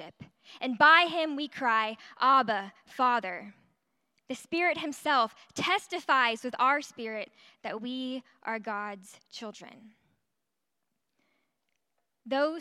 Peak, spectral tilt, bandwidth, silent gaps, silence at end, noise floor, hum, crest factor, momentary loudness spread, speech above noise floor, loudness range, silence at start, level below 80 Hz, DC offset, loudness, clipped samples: -8 dBFS; -3 dB/octave; 13.5 kHz; none; 0 s; -86 dBFS; none; 24 dB; 19 LU; 57 dB; 15 LU; 0 s; -80 dBFS; under 0.1%; -28 LUFS; under 0.1%